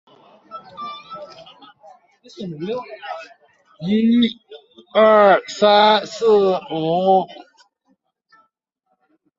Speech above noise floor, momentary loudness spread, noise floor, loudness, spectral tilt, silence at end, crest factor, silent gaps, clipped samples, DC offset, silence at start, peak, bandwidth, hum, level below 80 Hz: 55 dB; 23 LU; -71 dBFS; -16 LUFS; -5.5 dB/octave; 2.05 s; 18 dB; none; under 0.1%; under 0.1%; 0.5 s; -2 dBFS; 7.8 kHz; none; -64 dBFS